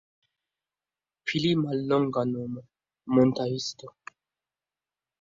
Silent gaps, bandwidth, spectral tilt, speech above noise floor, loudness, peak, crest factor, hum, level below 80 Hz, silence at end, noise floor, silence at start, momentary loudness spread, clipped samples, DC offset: none; 7.6 kHz; -6 dB/octave; over 64 dB; -27 LUFS; -10 dBFS; 20 dB; 50 Hz at -60 dBFS; -66 dBFS; 1.3 s; under -90 dBFS; 1.25 s; 19 LU; under 0.1%; under 0.1%